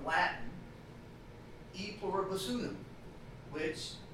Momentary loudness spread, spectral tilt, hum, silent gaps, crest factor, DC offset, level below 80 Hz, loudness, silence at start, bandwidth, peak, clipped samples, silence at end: 18 LU; -4.5 dB/octave; none; none; 22 dB; under 0.1%; -58 dBFS; -38 LUFS; 0 s; 16 kHz; -18 dBFS; under 0.1%; 0 s